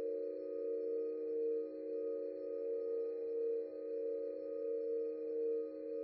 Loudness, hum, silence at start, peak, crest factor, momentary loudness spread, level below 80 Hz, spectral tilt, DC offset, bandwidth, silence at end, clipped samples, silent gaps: -41 LUFS; none; 0 s; -30 dBFS; 10 dB; 4 LU; under -90 dBFS; -6.5 dB/octave; under 0.1%; 4.6 kHz; 0 s; under 0.1%; none